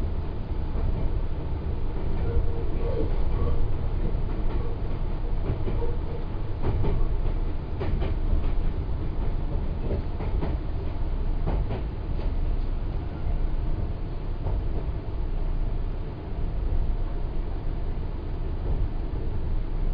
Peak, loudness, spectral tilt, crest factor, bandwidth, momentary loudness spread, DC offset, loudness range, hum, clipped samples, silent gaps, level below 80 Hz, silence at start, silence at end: -12 dBFS; -31 LUFS; -10.5 dB/octave; 14 dB; 5 kHz; 5 LU; under 0.1%; 3 LU; none; under 0.1%; none; -26 dBFS; 0 s; 0 s